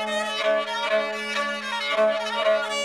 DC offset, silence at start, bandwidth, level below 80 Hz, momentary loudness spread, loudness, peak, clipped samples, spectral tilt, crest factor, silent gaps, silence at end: under 0.1%; 0 s; 13.5 kHz; -78 dBFS; 4 LU; -24 LUFS; -12 dBFS; under 0.1%; -1.5 dB/octave; 14 dB; none; 0 s